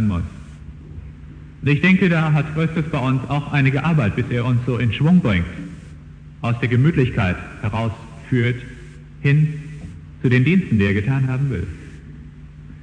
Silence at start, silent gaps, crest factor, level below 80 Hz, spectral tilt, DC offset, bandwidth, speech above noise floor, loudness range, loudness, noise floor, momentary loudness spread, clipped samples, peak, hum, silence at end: 0 s; none; 18 dB; -40 dBFS; -8.5 dB/octave; under 0.1%; 9.4 kHz; 21 dB; 3 LU; -19 LUFS; -39 dBFS; 23 LU; under 0.1%; -2 dBFS; none; 0 s